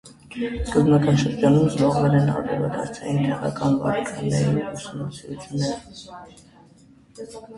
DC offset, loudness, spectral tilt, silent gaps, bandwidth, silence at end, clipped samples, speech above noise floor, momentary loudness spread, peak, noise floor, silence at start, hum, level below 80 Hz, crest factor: under 0.1%; -22 LUFS; -7 dB/octave; none; 11.5 kHz; 0 s; under 0.1%; 30 dB; 21 LU; -4 dBFS; -52 dBFS; 0.05 s; none; -44 dBFS; 18 dB